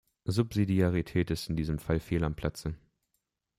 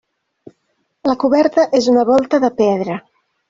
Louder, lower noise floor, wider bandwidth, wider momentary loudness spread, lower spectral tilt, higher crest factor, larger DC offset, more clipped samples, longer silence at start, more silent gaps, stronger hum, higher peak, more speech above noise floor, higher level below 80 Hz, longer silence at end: second, -31 LUFS vs -15 LUFS; first, -81 dBFS vs -67 dBFS; first, 15.5 kHz vs 7.6 kHz; about the same, 9 LU vs 9 LU; first, -7 dB/octave vs -5.5 dB/octave; about the same, 18 dB vs 14 dB; neither; neither; second, 0.25 s vs 1.05 s; neither; neither; second, -14 dBFS vs -2 dBFS; about the same, 52 dB vs 53 dB; first, -48 dBFS vs -58 dBFS; first, 0.8 s vs 0.5 s